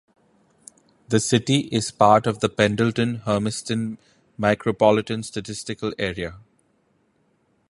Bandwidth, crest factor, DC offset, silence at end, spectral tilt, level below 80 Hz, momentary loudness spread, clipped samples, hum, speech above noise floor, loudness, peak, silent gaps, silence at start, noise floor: 11.5 kHz; 22 dB; under 0.1%; 1.3 s; -5 dB/octave; -54 dBFS; 13 LU; under 0.1%; none; 44 dB; -22 LUFS; 0 dBFS; none; 1.1 s; -65 dBFS